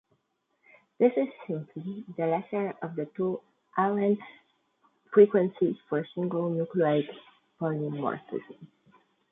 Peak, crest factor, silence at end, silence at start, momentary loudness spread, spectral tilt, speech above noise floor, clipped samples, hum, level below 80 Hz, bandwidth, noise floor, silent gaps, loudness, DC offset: -8 dBFS; 22 dB; 0.65 s; 1 s; 15 LU; -11 dB/octave; 48 dB; under 0.1%; none; -76 dBFS; 3.9 kHz; -76 dBFS; none; -29 LUFS; under 0.1%